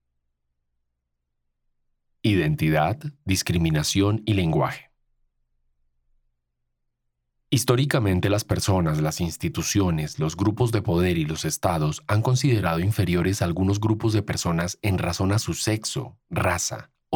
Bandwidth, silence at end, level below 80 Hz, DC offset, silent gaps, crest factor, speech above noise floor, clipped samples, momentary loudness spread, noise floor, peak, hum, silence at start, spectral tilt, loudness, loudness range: 19.5 kHz; 0 s; -46 dBFS; under 0.1%; none; 20 dB; 55 dB; under 0.1%; 6 LU; -78 dBFS; -4 dBFS; none; 2.25 s; -5.5 dB/octave; -24 LUFS; 4 LU